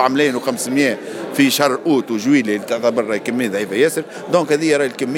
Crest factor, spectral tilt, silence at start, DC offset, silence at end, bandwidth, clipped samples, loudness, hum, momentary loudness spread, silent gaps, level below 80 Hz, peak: 16 dB; -4 dB/octave; 0 s; under 0.1%; 0 s; 17 kHz; under 0.1%; -17 LUFS; none; 5 LU; none; -72 dBFS; 0 dBFS